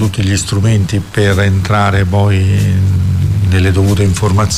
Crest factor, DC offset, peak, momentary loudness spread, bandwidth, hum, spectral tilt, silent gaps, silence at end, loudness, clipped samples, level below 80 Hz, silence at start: 8 dB; under 0.1%; -2 dBFS; 2 LU; 14 kHz; none; -6 dB/octave; none; 0 s; -12 LUFS; under 0.1%; -30 dBFS; 0 s